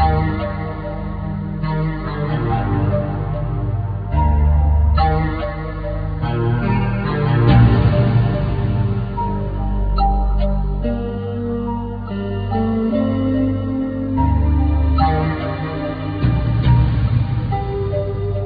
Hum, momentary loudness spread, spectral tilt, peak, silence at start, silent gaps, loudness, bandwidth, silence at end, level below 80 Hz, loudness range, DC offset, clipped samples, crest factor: none; 9 LU; -11 dB/octave; -2 dBFS; 0 s; none; -19 LUFS; 5 kHz; 0 s; -22 dBFS; 5 LU; under 0.1%; under 0.1%; 14 dB